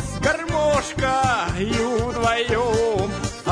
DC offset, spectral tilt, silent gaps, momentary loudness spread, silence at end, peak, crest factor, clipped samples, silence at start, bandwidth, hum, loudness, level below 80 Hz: under 0.1%; -4.5 dB/octave; none; 3 LU; 0 s; -6 dBFS; 14 dB; under 0.1%; 0 s; 10.5 kHz; none; -21 LUFS; -36 dBFS